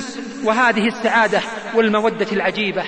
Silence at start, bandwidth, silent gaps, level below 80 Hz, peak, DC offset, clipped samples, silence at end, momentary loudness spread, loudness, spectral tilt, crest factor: 0 s; 10.5 kHz; none; -58 dBFS; -4 dBFS; 0.3%; under 0.1%; 0 s; 6 LU; -17 LUFS; -4.5 dB/octave; 14 dB